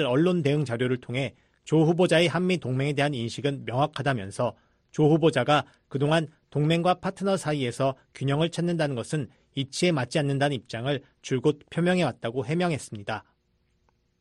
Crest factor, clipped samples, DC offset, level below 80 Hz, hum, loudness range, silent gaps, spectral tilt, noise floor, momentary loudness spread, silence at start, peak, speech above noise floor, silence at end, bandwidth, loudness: 18 dB; under 0.1%; under 0.1%; -62 dBFS; none; 3 LU; none; -6 dB/octave; -70 dBFS; 11 LU; 0 s; -8 dBFS; 45 dB; 1 s; 11.5 kHz; -26 LUFS